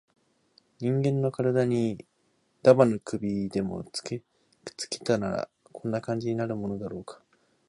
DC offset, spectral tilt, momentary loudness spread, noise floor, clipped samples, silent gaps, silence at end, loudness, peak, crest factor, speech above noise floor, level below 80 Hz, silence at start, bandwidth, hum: under 0.1%; -6.5 dB/octave; 17 LU; -70 dBFS; under 0.1%; none; 0.55 s; -28 LUFS; -4 dBFS; 24 dB; 44 dB; -62 dBFS; 0.8 s; 11.5 kHz; none